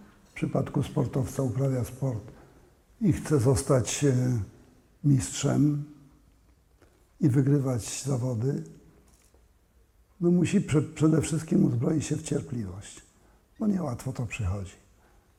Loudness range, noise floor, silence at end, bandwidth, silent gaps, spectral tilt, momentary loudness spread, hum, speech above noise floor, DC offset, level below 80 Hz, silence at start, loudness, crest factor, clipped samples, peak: 3 LU; -62 dBFS; 0.65 s; 15 kHz; none; -6.5 dB/octave; 12 LU; none; 36 dB; under 0.1%; -52 dBFS; 0 s; -27 LUFS; 18 dB; under 0.1%; -10 dBFS